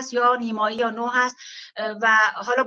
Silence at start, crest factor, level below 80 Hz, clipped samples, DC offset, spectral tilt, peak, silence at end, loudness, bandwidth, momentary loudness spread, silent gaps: 0 s; 16 dB; -74 dBFS; under 0.1%; under 0.1%; -2.5 dB/octave; -6 dBFS; 0 s; -21 LUFS; 7.8 kHz; 13 LU; none